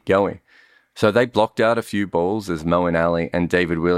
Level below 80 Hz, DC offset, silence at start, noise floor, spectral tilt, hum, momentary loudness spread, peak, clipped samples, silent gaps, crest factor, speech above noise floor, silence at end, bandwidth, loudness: -48 dBFS; under 0.1%; 0.05 s; -54 dBFS; -6.5 dB/octave; none; 5 LU; -4 dBFS; under 0.1%; none; 16 dB; 35 dB; 0 s; 15 kHz; -20 LUFS